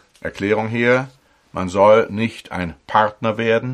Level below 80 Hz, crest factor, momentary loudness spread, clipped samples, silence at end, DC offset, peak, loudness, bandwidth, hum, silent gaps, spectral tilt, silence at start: -52 dBFS; 18 dB; 14 LU; under 0.1%; 0 s; under 0.1%; -2 dBFS; -18 LUFS; 10.5 kHz; none; none; -6.5 dB/octave; 0.25 s